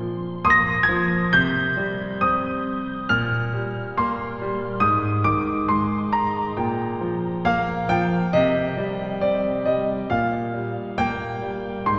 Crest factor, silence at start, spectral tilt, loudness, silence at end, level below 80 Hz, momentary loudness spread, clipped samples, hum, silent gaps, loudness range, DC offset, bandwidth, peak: 16 dB; 0 s; -8 dB/octave; -22 LUFS; 0 s; -44 dBFS; 9 LU; under 0.1%; none; none; 3 LU; 0.2%; 7 kHz; -6 dBFS